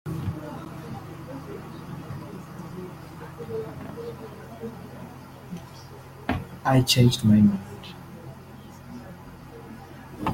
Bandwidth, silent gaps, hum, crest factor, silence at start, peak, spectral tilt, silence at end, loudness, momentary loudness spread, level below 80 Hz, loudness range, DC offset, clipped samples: 16.5 kHz; none; none; 22 dB; 0.05 s; -6 dBFS; -5.5 dB/octave; 0 s; -26 LUFS; 24 LU; -52 dBFS; 14 LU; under 0.1%; under 0.1%